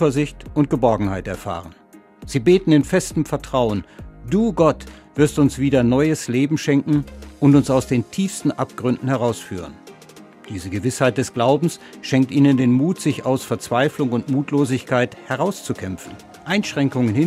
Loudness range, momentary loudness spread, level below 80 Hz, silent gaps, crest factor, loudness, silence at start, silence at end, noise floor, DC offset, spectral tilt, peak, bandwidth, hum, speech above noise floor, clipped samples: 4 LU; 14 LU; -44 dBFS; none; 18 dB; -19 LUFS; 0 s; 0 s; -44 dBFS; under 0.1%; -6.5 dB/octave; -2 dBFS; 15.5 kHz; none; 25 dB; under 0.1%